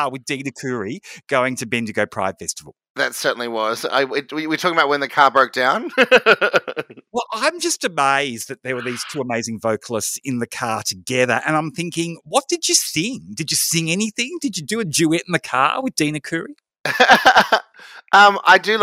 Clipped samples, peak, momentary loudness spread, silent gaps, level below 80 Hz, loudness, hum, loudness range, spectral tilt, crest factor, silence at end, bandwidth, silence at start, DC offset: under 0.1%; -2 dBFS; 13 LU; 2.90-2.95 s, 16.80-16.84 s; -64 dBFS; -18 LUFS; none; 6 LU; -2.5 dB/octave; 18 dB; 0 s; 16 kHz; 0 s; under 0.1%